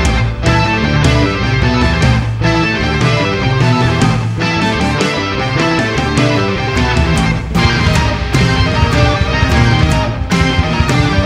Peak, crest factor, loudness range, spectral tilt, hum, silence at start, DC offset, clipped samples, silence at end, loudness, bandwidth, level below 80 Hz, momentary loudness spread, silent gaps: 0 dBFS; 12 dB; 1 LU; -5.5 dB/octave; none; 0 s; under 0.1%; under 0.1%; 0 s; -13 LUFS; 12 kHz; -22 dBFS; 3 LU; none